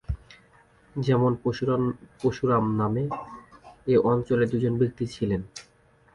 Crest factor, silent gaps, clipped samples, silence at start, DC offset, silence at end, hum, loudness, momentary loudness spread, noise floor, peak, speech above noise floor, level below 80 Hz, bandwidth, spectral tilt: 16 dB; none; under 0.1%; 0.1 s; under 0.1%; 0.55 s; none; -26 LUFS; 15 LU; -59 dBFS; -10 dBFS; 35 dB; -48 dBFS; 11 kHz; -8 dB/octave